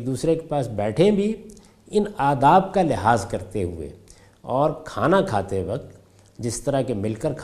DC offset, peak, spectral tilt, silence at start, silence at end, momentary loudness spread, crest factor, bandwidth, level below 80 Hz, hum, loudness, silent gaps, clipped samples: under 0.1%; -2 dBFS; -6.5 dB/octave; 0 s; 0 s; 12 LU; 20 dB; 14.5 kHz; -48 dBFS; none; -22 LUFS; none; under 0.1%